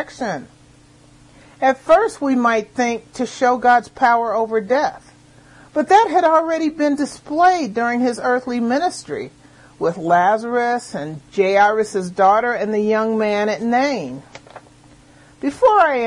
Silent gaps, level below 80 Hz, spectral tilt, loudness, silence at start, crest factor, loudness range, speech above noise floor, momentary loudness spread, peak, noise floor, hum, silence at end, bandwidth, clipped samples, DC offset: none; -56 dBFS; -5 dB/octave; -17 LUFS; 0 s; 16 dB; 3 LU; 31 dB; 12 LU; -2 dBFS; -48 dBFS; none; 0 s; 11 kHz; under 0.1%; under 0.1%